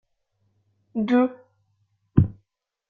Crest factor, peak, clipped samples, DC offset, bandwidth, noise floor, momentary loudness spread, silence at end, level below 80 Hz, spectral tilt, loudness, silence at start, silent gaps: 24 dB; -2 dBFS; under 0.1%; under 0.1%; 4.8 kHz; -73 dBFS; 8 LU; 0.55 s; -50 dBFS; -10 dB/octave; -24 LUFS; 0.95 s; none